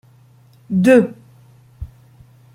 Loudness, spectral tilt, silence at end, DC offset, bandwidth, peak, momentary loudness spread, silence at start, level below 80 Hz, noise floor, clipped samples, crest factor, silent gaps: -15 LUFS; -7.5 dB/octave; 0.7 s; under 0.1%; 15 kHz; -2 dBFS; 25 LU; 0.7 s; -44 dBFS; -49 dBFS; under 0.1%; 18 dB; none